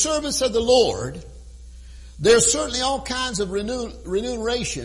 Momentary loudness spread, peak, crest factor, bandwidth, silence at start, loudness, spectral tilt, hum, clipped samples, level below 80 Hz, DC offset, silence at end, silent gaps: 13 LU; -4 dBFS; 18 dB; 11.5 kHz; 0 s; -21 LUFS; -2.5 dB/octave; none; under 0.1%; -40 dBFS; under 0.1%; 0 s; none